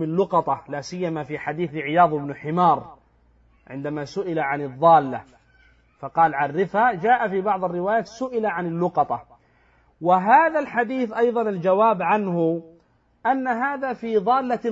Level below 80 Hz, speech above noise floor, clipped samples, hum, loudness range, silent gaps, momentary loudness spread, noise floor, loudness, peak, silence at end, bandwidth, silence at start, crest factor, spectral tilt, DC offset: -62 dBFS; 38 dB; under 0.1%; none; 4 LU; none; 11 LU; -60 dBFS; -22 LUFS; -4 dBFS; 0 s; 7.8 kHz; 0 s; 18 dB; -7 dB/octave; under 0.1%